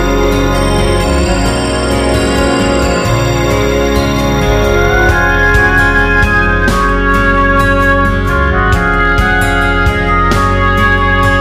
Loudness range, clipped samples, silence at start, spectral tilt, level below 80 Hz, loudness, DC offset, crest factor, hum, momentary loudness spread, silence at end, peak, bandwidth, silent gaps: 2 LU; under 0.1%; 0 s; -5.5 dB/octave; -16 dBFS; -10 LUFS; 0.5%; 10 dB; none; 3 LU; 0 s; 0 dBFS; 15.5 kHz; none